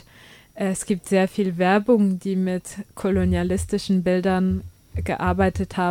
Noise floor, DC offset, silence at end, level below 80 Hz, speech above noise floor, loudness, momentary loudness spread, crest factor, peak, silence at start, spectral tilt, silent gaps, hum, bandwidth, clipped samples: -49 dBFS; under 0.1%; 0 s; -40 dBFS; 28 dB; -22 LUFS; 9 LU; 16 dB; -6 dBFS; 0.55 s; -6.5 dB/octave; none; none; 15.5 kHz; under 0.1%